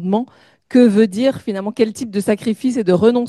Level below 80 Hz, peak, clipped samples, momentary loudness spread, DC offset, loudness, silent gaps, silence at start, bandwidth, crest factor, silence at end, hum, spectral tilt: -60 dBFS; 0 dBFS; under 0.1%; 9 LU; under 0.1%; -16 LUFS; none; 0 s; 12.5 kHz; 14 dB; 0 s; none; -6.5 dB/octave